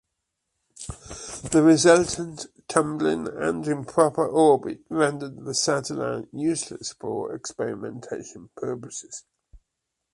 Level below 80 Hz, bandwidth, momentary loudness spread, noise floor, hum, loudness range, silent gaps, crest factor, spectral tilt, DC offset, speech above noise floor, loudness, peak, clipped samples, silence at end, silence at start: -56 dBFS; 11.5 kHz; 18 LU; -82 dBFS; none; 10 LU; none; 22 dB; -4.5 dB/octave; under 0.1%; 58 dB; -24 LUFS; -4 dBFS; under 0.1%; 0.95 s; 0.8 s